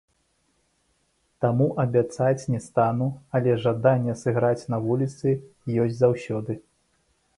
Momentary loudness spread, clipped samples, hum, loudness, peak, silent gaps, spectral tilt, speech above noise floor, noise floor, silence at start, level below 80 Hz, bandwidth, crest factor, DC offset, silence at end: 7 LU; under 0.1%; none; -24 LUFS; -6 dBFS; none; -8 dB/octave; 46 dB; -69 dBFS; 1.4 s; -60 dBFS; 11 kHz; 20 dB; under 0.1%; 0.75 s